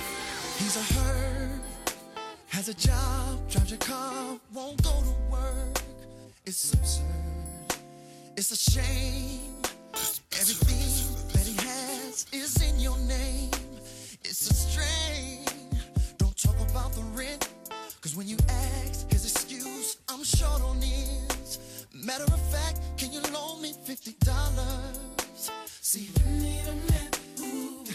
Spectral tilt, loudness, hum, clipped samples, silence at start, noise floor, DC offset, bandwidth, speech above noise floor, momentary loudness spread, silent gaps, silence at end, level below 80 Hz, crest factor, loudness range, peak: -3.5 dB/octave; -30 LUFS; none; under 0.1%; 0 s; -49 dBFS; under 0.1%; 16.5 kHz; 22 dB; 10 LU; none; 0 s; -32 dBFS; 18 dB; 3 LU; -10 dBFS